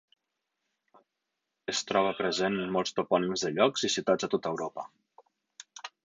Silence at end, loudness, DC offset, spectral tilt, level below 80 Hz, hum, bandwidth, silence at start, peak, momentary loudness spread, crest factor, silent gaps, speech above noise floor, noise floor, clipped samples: 0.2 s; -29 LUFS; under 0.1%; -3.5 dB/octave; -70 dBFS; none; 9.4 kHz; 1.7 s; -10 dBFS; 17 LU; 22 dB; none; 56 dB; -85 dBFS; under 0.1%